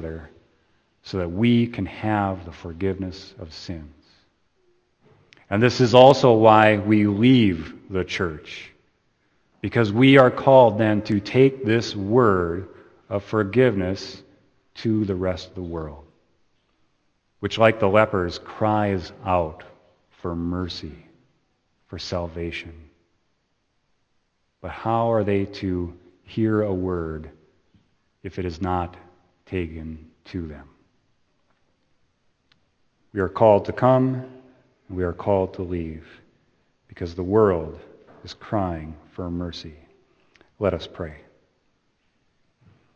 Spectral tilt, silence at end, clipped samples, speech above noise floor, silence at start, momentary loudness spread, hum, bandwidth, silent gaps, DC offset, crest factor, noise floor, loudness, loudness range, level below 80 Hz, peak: -7 dB/octave; 1.8 s; under 0.1%; 50 dB; 0 s; 22 LU; none; 8.6 kHz; none; under 0.1%; 24 dB; -70 dBFS; -21 LUFS; 16 LU; -50 dBFS; 0 dBFS